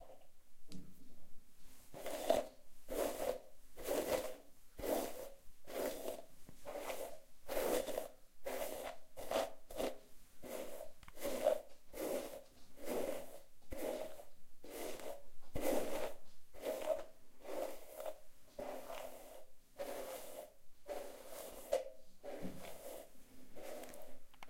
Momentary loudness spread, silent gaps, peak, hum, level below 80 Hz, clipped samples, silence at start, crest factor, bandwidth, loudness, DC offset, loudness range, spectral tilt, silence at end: 21 LU; none; -18 dBFS; none; -60 dBFS; under 0.1%; 0 s; 24 dB; 16 kHz; -45 LUFS; under 0.1%; 6 LU; -3.5 dB/octave; 0 s